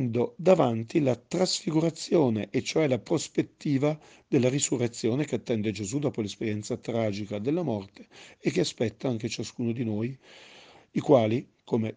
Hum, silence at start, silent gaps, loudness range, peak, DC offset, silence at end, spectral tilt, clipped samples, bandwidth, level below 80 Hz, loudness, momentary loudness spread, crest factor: none; 0 s; none; 5 LU; -6 dBFS; under 0.1%; 0 s; -5.5 dB/octave; under 0.1%; 10 kHz; -68 dBFS; -28 LUFS; 9 LU; 22 dB